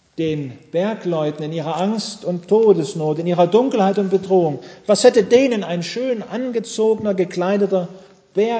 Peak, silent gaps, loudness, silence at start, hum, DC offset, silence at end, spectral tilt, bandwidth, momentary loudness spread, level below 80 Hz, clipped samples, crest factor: 0 dBFS; none; -18 LUFS; 0.2 s; none; under 0.1%; 0 s; -6 dB/octave; 8 kHz; 10 LU; -62 dBFS; under 0.1%; 18 dB